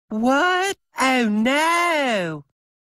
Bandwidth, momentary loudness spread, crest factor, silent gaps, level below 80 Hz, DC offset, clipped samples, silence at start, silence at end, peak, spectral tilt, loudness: 16 kHz; 7 LU; 14 dB; none; -62 dBFS; under 0.1%; under 0.1%; 0.1 s; 0.6 s; -6 dBFS; -3.5 dB/octave; -19 LUFS